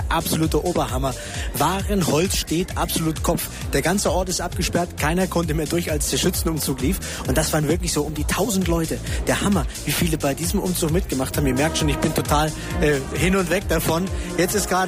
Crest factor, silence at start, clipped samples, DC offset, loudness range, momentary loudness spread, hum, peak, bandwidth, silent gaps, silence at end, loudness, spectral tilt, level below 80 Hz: 16 dB; 0 s; under 0.1%; under 0.1%; 1 LU; 4 LU; none; -6 dBFS; 15.5 kHz; none; 0 s; -22 LUFS; -4.5 dB/octave; -30 dBFS